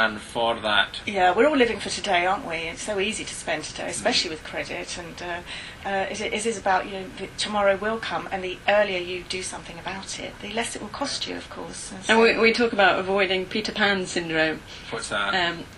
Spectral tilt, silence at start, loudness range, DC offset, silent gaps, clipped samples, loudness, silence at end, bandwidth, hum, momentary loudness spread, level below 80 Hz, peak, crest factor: -3 dB/octave; 0 s; 6 LU; under 0.1%; none; under 0.1%; -24 LUFS; 0 s; 12.5 kHz; none; 14 LU; -50 dBFS; -4 dBFS; 20 dB